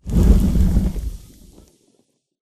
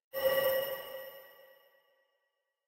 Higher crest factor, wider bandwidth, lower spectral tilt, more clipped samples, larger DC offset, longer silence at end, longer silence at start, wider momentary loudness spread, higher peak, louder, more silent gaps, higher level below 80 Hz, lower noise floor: about the same, 18 dB vs 18 dB; second, 14 kHz vs 16 kHz; first, -8 dB/octave vs -2 dB/octave; neither; neither; about the same, 1.25 s vs 1.25 s; about the same, 0.05 s vs 0.15 s; about the same, 17 LU vs 19 LU; first, 0 dBFS vs -18 dBFS; first, -18 LUFS vs -33 LUFS; neither; first, -20 dBFS vs -72 dBFS; second, -64 dBFS vs -83 dBFS